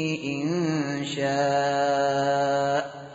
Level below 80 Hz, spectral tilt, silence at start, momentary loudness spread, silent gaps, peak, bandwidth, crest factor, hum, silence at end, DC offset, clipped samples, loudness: -66 dBFS; -4 dB/octave; 0 s; 5 LU; none; -14 dBFS; 8 kHz; 12 dB; none; 0 s; under 0.1%; under 0.1%; -25 LUFS